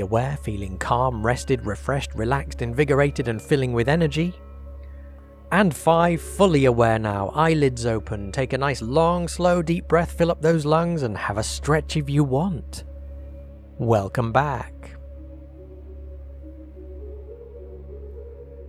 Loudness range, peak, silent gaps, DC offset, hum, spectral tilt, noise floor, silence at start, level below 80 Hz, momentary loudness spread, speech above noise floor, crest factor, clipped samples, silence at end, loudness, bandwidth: 9 LU; -4 dBFS; none; under 0.1%; none; -6.5 dB/octave; -42 dBFS; 0 s; -38 dBFS; 22 LU; 21 dB; 20 dB; under 0.1%; 0 s; -22 LUFS; 14.5 kHz